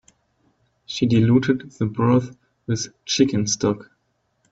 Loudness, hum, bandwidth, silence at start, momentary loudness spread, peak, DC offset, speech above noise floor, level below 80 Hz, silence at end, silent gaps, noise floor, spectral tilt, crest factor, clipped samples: -21 LUFS; none; 8 kHz; 0.9 s; 14 LU; -4 dBFS; under 0.1%; 50 dB; -56 dBFS; 0.7 s; none; -70 dBFS; -5.5 dB/octave; 18 dB; under 0.1%